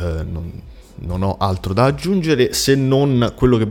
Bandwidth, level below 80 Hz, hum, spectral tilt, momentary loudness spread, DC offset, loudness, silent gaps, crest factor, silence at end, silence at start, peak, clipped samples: 18 kHz; -34 dBFS; none; -6 dB/octave; 14 LU; under 0.1%; -17 LUFS; none; 16 dB; 0 s; 0 s; 0 dBFS; under 0.1%